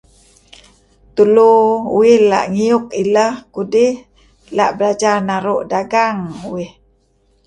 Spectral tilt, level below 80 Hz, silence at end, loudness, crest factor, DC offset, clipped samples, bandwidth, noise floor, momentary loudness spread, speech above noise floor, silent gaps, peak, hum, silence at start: -5.5 dB/octave; -54 dBFS; 0.8 s; -14 LUFS; 14 dB; under 0.1%; under 0.1%; 10.5 kHz; -57 dBFS; 15 LU; 44 dB; none; 0 dBFS; none; 1.15 s